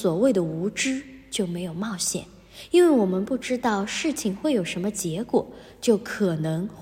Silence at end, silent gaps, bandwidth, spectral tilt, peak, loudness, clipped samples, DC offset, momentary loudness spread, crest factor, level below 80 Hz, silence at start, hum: 0 s; none; 16 kHz; -5 dB/octave; -8 dBFS; -25 LUFS; under 0.1%; under 0.1%; 10 LU; 16 dB; -56 dBFS; 0 s; none